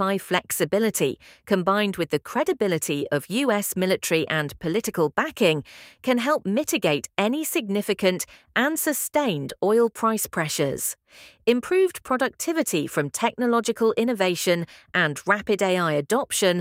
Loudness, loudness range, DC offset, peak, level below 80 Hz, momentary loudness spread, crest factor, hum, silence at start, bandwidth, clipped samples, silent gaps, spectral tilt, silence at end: -23 LUFS; 1 LU; under 0.1%; -4 dBFS; -62 dBFS; 5 LU; 20 dB; none; 0 s; 16.5 kHz; under 0.1%; none; -4 dB/octave; 0 s